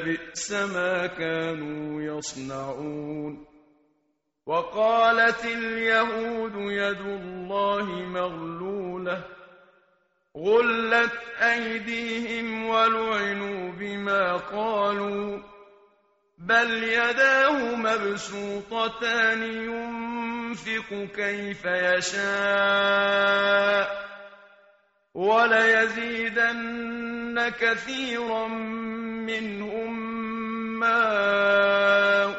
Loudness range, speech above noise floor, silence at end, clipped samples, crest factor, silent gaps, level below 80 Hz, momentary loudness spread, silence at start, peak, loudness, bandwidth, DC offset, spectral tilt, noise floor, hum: 7 LU; 49 dB; 0 s; under 0.1%; 18 dB; none; -62 dBFS; 13 LU; 0 s; -8 dBFS; -25 LUFS; 8 kHz; under 0.1%; -1.5 dB/octave; -74 dBFS; none